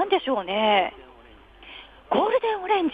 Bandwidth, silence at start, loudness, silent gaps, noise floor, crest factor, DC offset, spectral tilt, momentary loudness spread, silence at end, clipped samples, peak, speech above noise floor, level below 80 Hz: 5 kHz; 0 s; -23 LUFS; none; -50 dBFS; 18 dB; under 0.1%; -6.5 dB/octave; 21 LU; 0 s; under 0.1%; -8 dBFS; 27 dB; -56 dBFS